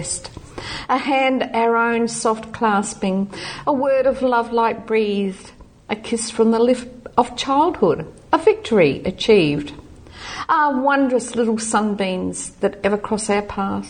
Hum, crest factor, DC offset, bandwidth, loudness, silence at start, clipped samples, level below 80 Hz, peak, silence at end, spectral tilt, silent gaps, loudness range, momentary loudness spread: none; 18 dB; under 0.1%; 9.8 kHz; -19 LUFS; 0 s; under 0.1%; -48 dBFS; -2 dBFS; 0 s; -4.5 dB/octave; none; 2 LU; 11 LU